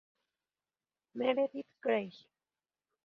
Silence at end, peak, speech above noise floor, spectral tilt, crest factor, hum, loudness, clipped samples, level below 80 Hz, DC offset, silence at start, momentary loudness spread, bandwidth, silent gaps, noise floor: 0.9 s; -18 dBFS; over 56 dB; -3 dB/octave; 22 dB; none; -35 LUFS; under 0.1%; -86 dBFS; under 0.1%; 1.15 s; 14 LU; 6 kHz; none; under -90 dBFS